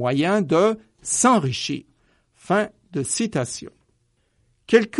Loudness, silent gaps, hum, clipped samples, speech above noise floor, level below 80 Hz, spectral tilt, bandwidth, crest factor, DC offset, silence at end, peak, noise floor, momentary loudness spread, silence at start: -22 LUFS; none; none; under 0.1%; 46 dB; -60 dBFS; -4 dB/octave; 11.5 kHz; 20 dB; under 0.1%; 0 s; -2 dBFS; -66 dBFS; 12 LU; 0 s